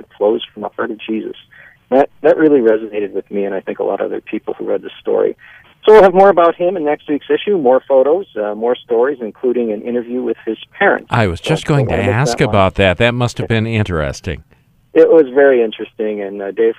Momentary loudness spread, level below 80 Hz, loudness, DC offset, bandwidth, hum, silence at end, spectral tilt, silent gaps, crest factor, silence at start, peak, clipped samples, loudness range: 13 LU; -40 dBFS; -14 LUFS; under 0.1%; 11.5 kHz; none; 0.05 s; -6.5 dB/octave; none; 14 dB; 0.2 s; 0 dBFS; under 0.1%; 5 LU